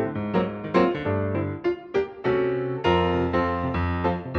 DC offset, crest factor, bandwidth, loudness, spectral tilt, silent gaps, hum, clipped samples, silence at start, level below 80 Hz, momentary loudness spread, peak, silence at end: under 0.1%; 18 dB; 6.6 kHz; -25 LUFS; -8.5 dB/octave; none; none; under 0.1%; 0 s; -44 dBFS; 5 LU; -6 dBFS; 0 s